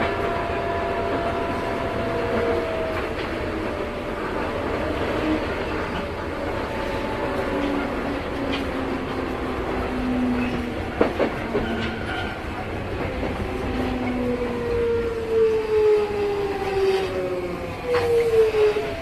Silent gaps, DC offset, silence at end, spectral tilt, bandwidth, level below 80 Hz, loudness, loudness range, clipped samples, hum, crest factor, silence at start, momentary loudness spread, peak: none; under 0.1%; 0 s; -6.5 dB/octave; 14 kHz; -38 dBFS; -24 LUFS; 4 LU; under 0.1%; none; 22 dB; 0 s; 7 LU; -2 dBFS